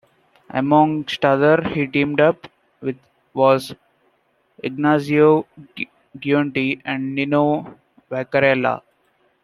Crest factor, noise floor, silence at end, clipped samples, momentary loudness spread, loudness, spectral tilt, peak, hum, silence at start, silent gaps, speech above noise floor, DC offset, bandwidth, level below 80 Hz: 18 dB; -64 dBFS; 0.65 s; under 0.1%; 15 LU; -19 LUFS; -7 dB/octave; -2 dBFS; none; 0.55 s; none; 46 dB; under 0.1%; 12.5 kHz; -60 dBFS